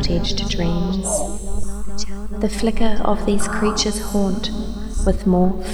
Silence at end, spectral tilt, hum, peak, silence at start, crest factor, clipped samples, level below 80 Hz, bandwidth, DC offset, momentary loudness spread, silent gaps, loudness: 0 s; -5 dB/octave; none; -4 dBFS; 0 s; 14 dB; under 0.1%; -26 dBFS; 13.5 kHz; under 0.1%; 11 LU; none; -21 LUFS